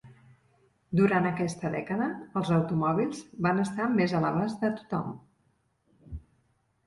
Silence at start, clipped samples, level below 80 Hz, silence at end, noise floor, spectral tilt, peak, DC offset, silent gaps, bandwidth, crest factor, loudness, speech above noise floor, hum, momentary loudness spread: 0.05 s; under 0.1%; -56 dBFS; 0.65 s; -71 dBFS; -7.5 dB/octave; -12 dBFS; under 0.1%; none; 11.5 kHz; 18 dB; -28 LUFS; 43 dB; none; 15 LU